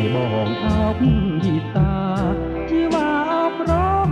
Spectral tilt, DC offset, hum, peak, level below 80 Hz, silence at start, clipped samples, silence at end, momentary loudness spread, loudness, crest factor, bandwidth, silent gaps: -8 dB/octave; under 0.1%; none; -4 dBFS; -30 dBFS; 0 s; under 0.1%; 0 s; 3 LU; -20 LUFS; 14 dB; 9.6 kHz; none